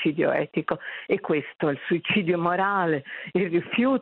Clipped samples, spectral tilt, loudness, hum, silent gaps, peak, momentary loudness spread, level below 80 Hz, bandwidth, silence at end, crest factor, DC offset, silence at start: under 0.1%; -9.5 dB/octave; -25 LUFS; none; none; -10 dBFS; 6 LU; -66 dBFS; 4.3 kHz; 0 s; 16 dB; under 0.1%; 0 s